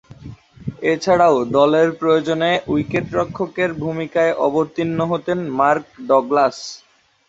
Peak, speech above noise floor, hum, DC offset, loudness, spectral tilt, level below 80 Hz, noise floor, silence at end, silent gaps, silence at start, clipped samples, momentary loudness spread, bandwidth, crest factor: 0 dBFS; 21 dB; none; under 0.1%; -18 LUFS; -6 dB/octave; -52 dBFS; -38 dBFS; 0.5 s; none; 0.1 s; under 0.1%; 9 LU; 8 kHz; 18 dB